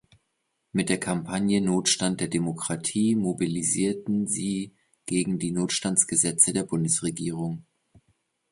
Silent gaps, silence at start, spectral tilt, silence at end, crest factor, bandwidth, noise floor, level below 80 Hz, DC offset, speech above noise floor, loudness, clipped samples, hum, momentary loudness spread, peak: none; 0.75 s; -4 dB/octave; 0.9 s; 24 dB; 11.5 kHz; -77 dBFS; -60 dBFS; under 0.1%; 51 dB; -25 LUFS; under 0.1%; none; 10 LU; -2 dBFS